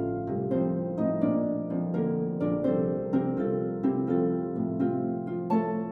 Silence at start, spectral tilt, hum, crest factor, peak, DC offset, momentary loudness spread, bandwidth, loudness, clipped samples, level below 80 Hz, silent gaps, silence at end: 0 s; -11.5 dB/octave; none; 14 dB; -14 dBFS; under 0.1%; 4 LU; 4.7 kHz; -28 LUFS; under 0.1%; -60 dBFS; none; 0 s